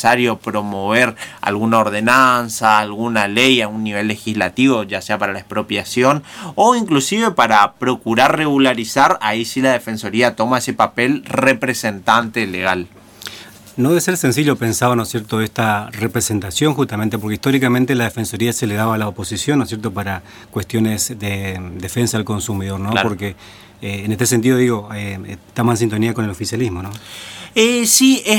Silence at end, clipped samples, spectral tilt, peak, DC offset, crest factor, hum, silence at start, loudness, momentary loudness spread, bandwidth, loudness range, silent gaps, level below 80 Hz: 0 s; under 0.1%; -4 dB/octave; 0 dBFS; under 0.1%; 16 dB; none; 0 s; -16 LUFS; 12 LU; 18.5 kHz; 6 LU; none; -52 dBFS